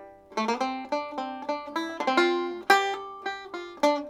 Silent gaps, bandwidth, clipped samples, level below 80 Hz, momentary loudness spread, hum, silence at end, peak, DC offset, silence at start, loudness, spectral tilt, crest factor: none; 17.5 kHz; under 0.1%; -70 dBFS; 13 LU; none; 0 s; -4 dBFS; under 0.1%; 0 s; -28 LUFS; -2.5 dB/octave; 24 dB